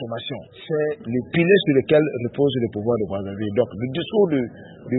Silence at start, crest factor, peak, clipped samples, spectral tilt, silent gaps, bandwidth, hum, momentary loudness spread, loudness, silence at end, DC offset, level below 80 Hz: 0 s; 18 dB; -4 dBFS; under 0.1%; -11.5 dB/octave; none; 4.1 kHz; none; 13 LU; -21 LUFS; 0 s; under 0.1%; -56 dBFS